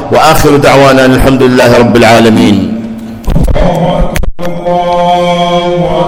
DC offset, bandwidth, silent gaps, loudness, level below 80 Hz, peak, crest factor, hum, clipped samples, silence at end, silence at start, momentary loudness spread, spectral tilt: under 0.1%; over 20 kHz; none; -6 LUFS; -18 dBFS; 0 dBFS; 6 dB; none; 10%; 0 s; 0 s; 12 LU; -5.5 dB/octave